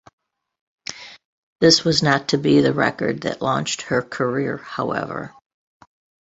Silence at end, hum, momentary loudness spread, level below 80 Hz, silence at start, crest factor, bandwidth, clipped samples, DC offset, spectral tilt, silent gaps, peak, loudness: 0.95 s; none; 18 LU; -56 dBFS; 0.9 s; 20 dB; 8.2 kHz; under 0.1%; under 0.1%; -4.5 dB/octave; 1.25-1.56 s; -2 dBFS; -19 LUFS